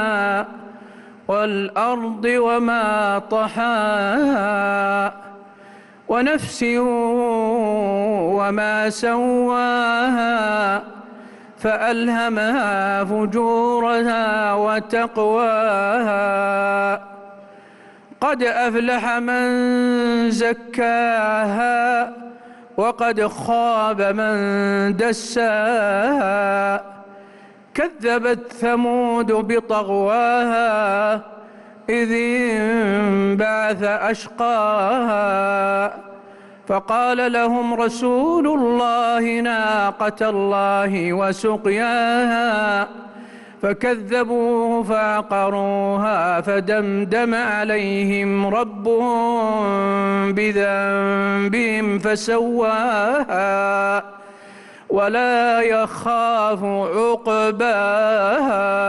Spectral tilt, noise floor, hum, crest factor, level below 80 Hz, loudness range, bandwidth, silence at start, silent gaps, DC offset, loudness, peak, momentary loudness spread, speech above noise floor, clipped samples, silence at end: -5.5 dB/octave; -45 dBFS; none; 10 dB; -56 dBFS; 2 LU; 12 kHz; 0 s; none; under 0.1%; -19 LUFS; -10 dBFS; 4 LU; 27 dB; under 0.1%; 0 s